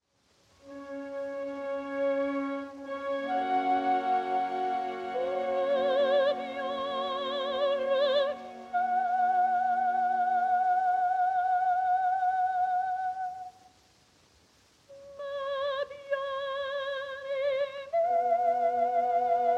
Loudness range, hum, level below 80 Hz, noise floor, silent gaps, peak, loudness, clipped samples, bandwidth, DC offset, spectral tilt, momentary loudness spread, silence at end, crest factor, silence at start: 8 LU; none; -74 dBFS; -68 dBFS; none; -16 dBFS; -29 LUFS; under 0.1%; 7.8 kHz; under 0.1%; -4 dB/octave; 10 LU; 0 s; 12 dB; 0.65 s